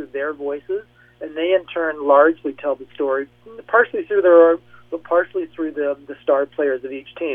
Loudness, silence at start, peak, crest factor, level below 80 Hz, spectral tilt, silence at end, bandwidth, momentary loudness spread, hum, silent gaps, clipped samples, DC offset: -19 LUFS; 0 s; -2 dBFS; 18 dB; -64 dBFS; -7.5 dB/octave; 0 s; 3.7 kHz; 15 LU; 60 Hz at -55 dBFS; none; under 0.1%; under 0.1%